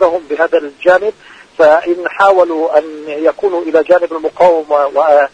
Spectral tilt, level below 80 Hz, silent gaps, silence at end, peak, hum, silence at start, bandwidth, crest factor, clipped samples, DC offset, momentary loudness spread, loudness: -5 dB/octave; -54 dBFS; none; 0.05 s; 0 dBFS; none; 0 s; 9.4 kHz; 12 dB; 0.4%; under 0.1%; 7 LU; -12 LUFS